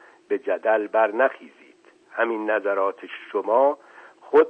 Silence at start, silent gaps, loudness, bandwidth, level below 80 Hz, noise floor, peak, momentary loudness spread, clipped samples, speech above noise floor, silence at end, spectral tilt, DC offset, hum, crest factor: 0.3 s; none; -23 LUFS; 5.2 kHz; -74 dBFS; -53 dBFS; -6 dBFS; 13 LU; under 0.1%; 31 dB; 0 s; -5.5 dB/octave; under 0.1%; none; 18 dB